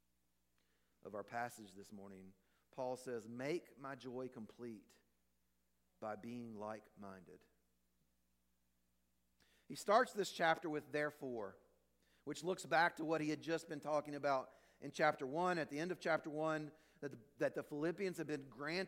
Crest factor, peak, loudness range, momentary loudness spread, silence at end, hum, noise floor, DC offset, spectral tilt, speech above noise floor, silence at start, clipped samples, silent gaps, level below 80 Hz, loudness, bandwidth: 24 dB; -20 dBFS; 14 LU; 19 LU; 0 s; 60 Hz at -80 dBFS; -84 dBFS; under 0.1%; -5 dB/octave; 42 dB; 1.05 s; under 0.1%; none; -84 dBFS; -42 LUFS; 16.5 kHz